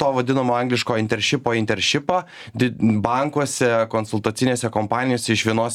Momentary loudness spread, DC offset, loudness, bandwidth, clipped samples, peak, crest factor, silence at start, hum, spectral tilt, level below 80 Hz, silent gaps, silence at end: 4 LU; under 0.1%; -20 LUFS; 15 kHz; under 0.1%; -2 dBFS; 18 dB; 0 s; none; -4.5 dB/octave; -56 dBFS; none; 0 s